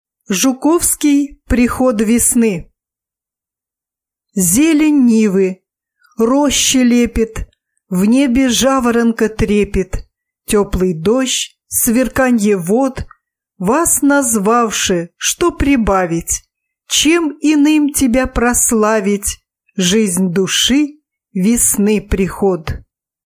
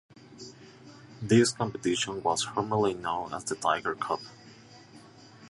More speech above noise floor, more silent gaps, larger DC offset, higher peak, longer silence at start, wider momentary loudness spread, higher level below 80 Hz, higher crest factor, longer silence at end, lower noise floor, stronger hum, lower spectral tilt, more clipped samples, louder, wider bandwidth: first, 74 dB vs 24 dB; neither; neither; first, 0 dBFS vs -10 dBFS; about the same, 0.3 s vs 0.3 s; second, 9 LU vs 23 LU; first, -32 dBFS vs -64 dBFS; second, 14 dB vs 20 dB; first, 0.5 s vs 0 s; first, -86 dBFS vs -52 dBFS; neither; about the same, -3.5 dB/octave vs -4.5 dB/octave; neither; first, -13 LUFS vs -28 LUFS; first, 16 kHz vs 11.5 kHz